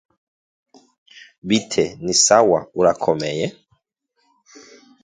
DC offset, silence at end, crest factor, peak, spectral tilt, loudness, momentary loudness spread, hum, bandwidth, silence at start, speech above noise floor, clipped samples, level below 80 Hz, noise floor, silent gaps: under 0.1%; 1.55 s; 22 dB; 0 dBFS; -3 dB/octave; -18 LUFS; 12 LU; none; 9.8 kHz; 1.45 s; 52 dB; under 0.1%; -56 dBFS; -70 dBFS; none